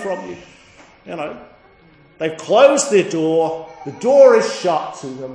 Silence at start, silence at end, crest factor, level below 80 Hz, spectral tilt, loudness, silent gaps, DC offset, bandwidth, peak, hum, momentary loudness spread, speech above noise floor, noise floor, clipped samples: 0 s; 0 s; 18 dB; -62 dBFS; -4 dB/octave; -15 LUFS; none; under 0.1%; 10.5 kHz; 0 dBFS; none; 19 LU; 33 dB; -49 dBFS; under 0.1%